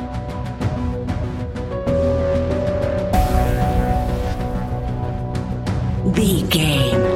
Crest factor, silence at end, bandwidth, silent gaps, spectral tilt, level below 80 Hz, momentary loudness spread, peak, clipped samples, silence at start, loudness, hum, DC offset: 16 dB; 0 s; 16.5 kHz; none; -6 dB/octave; -26 dBFS; 8 LU; -2 dBFS; under 0.1%; 0 s; -20 LUFS; none; 0.1%